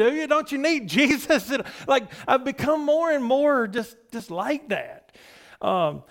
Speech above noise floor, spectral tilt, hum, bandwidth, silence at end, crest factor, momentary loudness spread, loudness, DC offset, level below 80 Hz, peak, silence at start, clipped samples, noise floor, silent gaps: 28 dB; -4.5 dB/octave; none; 17 kHz; 0.1 s; 16 dB; 10 LU; -23 LUFS; under 0.1%; -62 dBFS; -6 dBFS; 0 s; under 0.1%; -51 dBFS; none